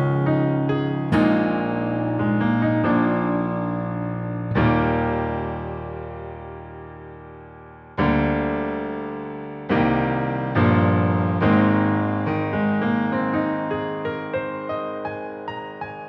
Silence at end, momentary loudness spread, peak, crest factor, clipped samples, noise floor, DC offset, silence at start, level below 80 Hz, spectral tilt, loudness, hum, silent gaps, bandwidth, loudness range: 0 s; 15 LU; -6 dBFS; 16 dB; under 0.1%; -43 dBFS; under 0.1%; 0 s; -42 dBFS; -9.5 dB/octave; -22 LUFS; none; none; 5.8 kHz; 6 LU